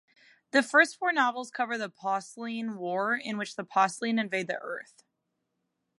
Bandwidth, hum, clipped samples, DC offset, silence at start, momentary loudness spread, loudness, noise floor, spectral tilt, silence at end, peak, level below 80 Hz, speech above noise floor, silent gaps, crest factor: 11.5 kHz; none; under 0.1%; under 0.1%; 0.55 s; 12 LU; -28 LUFS; -81 dBFS; -3.5 dB/octave; 1.2 s; -8 dBFS; -86 dBFS; 52 dB; none; 22 dB